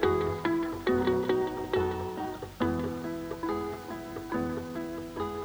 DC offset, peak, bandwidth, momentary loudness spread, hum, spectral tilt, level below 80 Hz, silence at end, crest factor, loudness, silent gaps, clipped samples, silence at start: under 0.1%; -12 dBFS; over 20 kHz; 9 LU; none; -6.5 dB/octave; -52 dBFS; 0 s; 20 dB; -32 LUFS; none; under 0.1%; 0 s